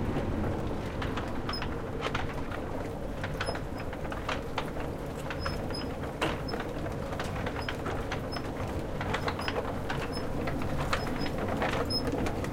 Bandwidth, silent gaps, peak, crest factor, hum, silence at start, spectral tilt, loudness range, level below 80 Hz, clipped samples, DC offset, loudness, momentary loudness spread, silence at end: 16.5 kHz; none; -14 dBFS; 20 dB; none; 0 s; -5.5 dB/octave; 3 LU; -42 dBFS; under 0.1%; under 0.1%; -34 LUFS; 5 LU; 0 s